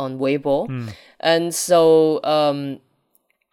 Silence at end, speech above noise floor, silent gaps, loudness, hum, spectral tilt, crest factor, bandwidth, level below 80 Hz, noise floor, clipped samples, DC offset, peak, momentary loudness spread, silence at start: 0.75 s; 47 dB; none; -18 LUFS; none; -4.5 dB/octave; 16 dB; 17 kHz; -60 dBFS; -65 dBFS; under 0.1%; under 0.1%; -4 dBFS; 17 LU; 0 s